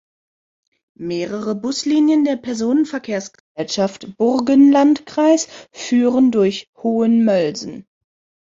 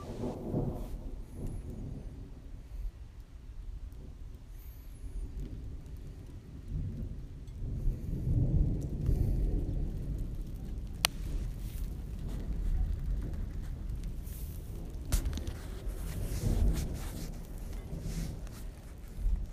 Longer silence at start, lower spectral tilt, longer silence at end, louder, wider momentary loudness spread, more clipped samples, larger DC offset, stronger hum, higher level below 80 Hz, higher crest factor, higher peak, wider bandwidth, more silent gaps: first, 1 s vs 0 s; about the same, -5 dB/octave vs -5.5 dB/octave; first, 0.65 s vs 0 s; first, -17 LUFS vs -39 LUFS; second, 13 LU vs 16 LU; neither; neither; neither; second, -62 dBFS vs -38 dBFS; second, 14 dB vs 32 dB; about the same, -4 dBFS vs -4 dBFS; second, 7.8 kHz vs 15.5 kHz; first, 3.40-3.55 s, 6.67-6.73 s vs none